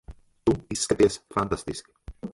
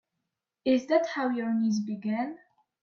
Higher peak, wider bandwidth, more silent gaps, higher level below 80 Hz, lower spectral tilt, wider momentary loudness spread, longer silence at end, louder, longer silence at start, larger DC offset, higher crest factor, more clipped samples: first, -8 dBFS vs -12 dBFS; first, 11.5 kHz vs 6.8 kHz; neither; first, -46 dBFS vs -76 dBFS; second, -4.5 dB/octave vs -6 dB/octave; first, 15 LU vs 8 LU; second, 0.05 s vs 0.45 s; first, -26 LUFS vs -29 LUFS; second, 0.1 s vs 0.65 s; neither; about the same, 20 dB vs 18 dB; neither